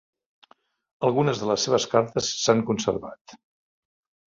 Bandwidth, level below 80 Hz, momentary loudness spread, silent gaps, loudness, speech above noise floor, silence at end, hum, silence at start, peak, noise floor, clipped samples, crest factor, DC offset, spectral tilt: 7.8 kHz; -60 dBFS; 6 LU; 3.21-3.25 s; -24 LUFS; 36 dB; 1 s; none; 1 s; -4 dBFS; -59 dBFS; under 0.1%; 22 dB; under 0.1%; -4.5 dB/octave